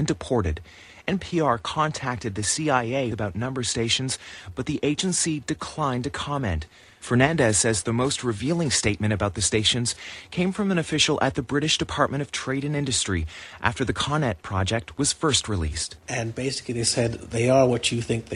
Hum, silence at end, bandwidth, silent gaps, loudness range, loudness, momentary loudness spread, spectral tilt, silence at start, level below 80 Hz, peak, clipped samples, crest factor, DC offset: none; 0 s; 11.5 kHz; none; 3 LU; -24 LUFS; 9 LU; -4 dB/octave; 0 s; -44 dBFS; -4 dBFS; under 0.1%; 20 dB; under 0.1%